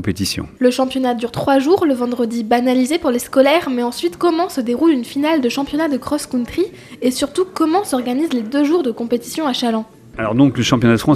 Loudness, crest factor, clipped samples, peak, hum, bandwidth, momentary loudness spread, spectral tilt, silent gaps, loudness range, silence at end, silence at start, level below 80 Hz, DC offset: -17 LUFS; 16 dB; under 0.1%; -2 dBFS; none; 15 kHz; 7 LU; -5.5 dB/octave; none; 3 LU; 0 s; 0 s; -48 dBFS; under 0.1%